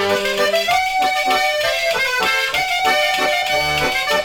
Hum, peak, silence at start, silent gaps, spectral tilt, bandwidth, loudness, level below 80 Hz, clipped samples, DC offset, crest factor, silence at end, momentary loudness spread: none; -6 dBFS; 0 s; none; -1.5 dB/octave; 19 kHz; -16 LUFS; -46 dBFS; under 0.1%; under 0.1%; 12 dB; 0 s; 2 LU